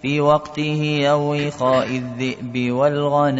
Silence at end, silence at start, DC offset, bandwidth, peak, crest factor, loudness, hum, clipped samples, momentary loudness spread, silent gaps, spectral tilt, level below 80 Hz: 0 s; 0 s; under 0.1%; 8 kHz; -4 dBFS; 16 dB; -19 LUFS; none; under 0.1%; 7 LU; none; -6.5 dB/octave; -56 dBFS